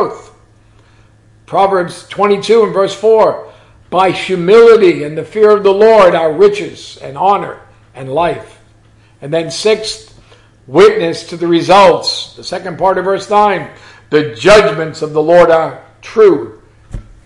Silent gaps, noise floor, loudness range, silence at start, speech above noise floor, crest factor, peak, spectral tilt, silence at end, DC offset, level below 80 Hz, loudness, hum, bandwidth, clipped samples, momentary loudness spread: none; -45 dBFS; 7 LU; 0 s; 35 dB; 12 dB; 0 dBFS; -5 dB/octave; 0.25 s; under 0.1%; -42 dBFS; -10 LUFS; none; 11.5 kHz; 0.3%; 16 LU